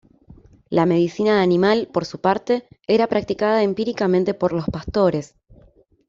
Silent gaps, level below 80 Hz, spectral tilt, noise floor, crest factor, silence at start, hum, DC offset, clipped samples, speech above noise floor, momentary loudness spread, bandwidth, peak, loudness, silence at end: none; -48 dBFS; -7 dB/octave; -53 dBFS; 16 dB; 0.3 s; none; under 0.1%; under 0.1%; 34 dB; 7 LU; 7.6 kHz; -4 dBFS; -20 LUFS; 0.85 s